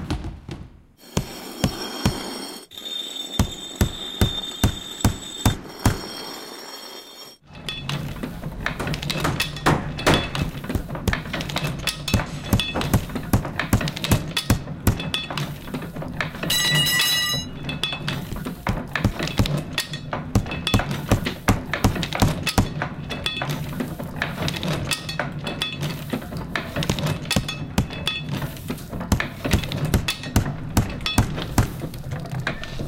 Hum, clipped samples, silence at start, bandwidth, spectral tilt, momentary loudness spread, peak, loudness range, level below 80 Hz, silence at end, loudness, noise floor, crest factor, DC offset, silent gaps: none; under 0.1%; 0 s; 17 kHz; -4.5 dB/octave; 10 LU; -4 dBFS; 5 LU; -34 dBFS; 0 s; -24 LUFS; -46 dBFS; 20 dB; under 0.1%; none